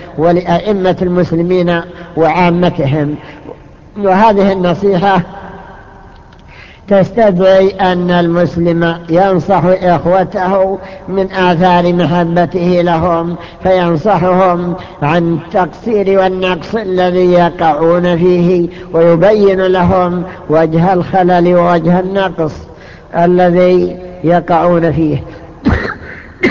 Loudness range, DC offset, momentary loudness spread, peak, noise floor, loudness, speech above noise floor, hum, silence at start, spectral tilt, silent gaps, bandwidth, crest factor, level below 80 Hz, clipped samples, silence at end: 3 LU; 0.6%; 9 LU; 0 dBFS; -36 dBFS; -11 LUFS; 26 dB; none; 0 s; -8.5 dB/octave; none; 7 kHz; 10 dB; -34 dBFS; under 0.1%; 0 s